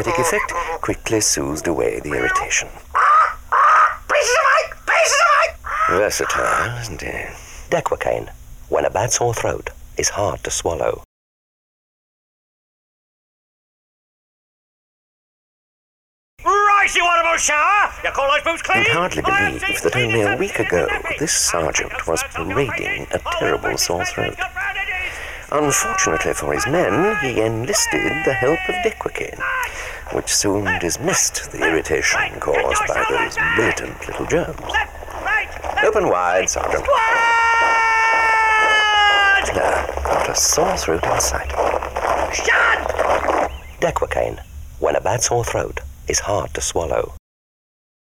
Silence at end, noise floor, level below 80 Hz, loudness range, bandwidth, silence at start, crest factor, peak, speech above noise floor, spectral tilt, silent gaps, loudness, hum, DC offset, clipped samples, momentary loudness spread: 0.95 s; under -90 dBFS; -38 dBFS; 7 LU; 17 kHz; 0 s; 12 dB; -6 dBFS; over 71 dB; -2.5 dB/octave; 11.05-16.37 s; -18 LUFS; none; under 0.1%; under 0.1%; 10 LU